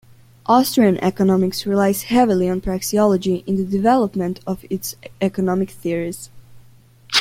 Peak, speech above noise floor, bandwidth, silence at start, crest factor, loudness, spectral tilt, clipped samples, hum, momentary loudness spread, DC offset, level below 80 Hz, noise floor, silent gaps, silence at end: -2 dBFS; 30 dB; 16.5 kHz; 0.5 s; 18 dB; -19 LUFS; -5.5 dB/octave; under 0.1%; none; 10 LU; under 0.1%; -46 dBFS; -48 dBFS; none; 0 s